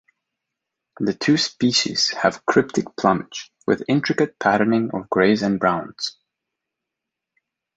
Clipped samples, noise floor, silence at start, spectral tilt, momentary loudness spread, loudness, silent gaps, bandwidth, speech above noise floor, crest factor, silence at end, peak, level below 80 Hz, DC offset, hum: under 0.1%; -84 dBFS; 1 s; -4.5 dB/octave; 9 LU; -20 LUFS; none; 9 kHz; 64 dB; 20 dB; 1.65 s; -2 dBFS; -58 dBFS; under 0.1%; none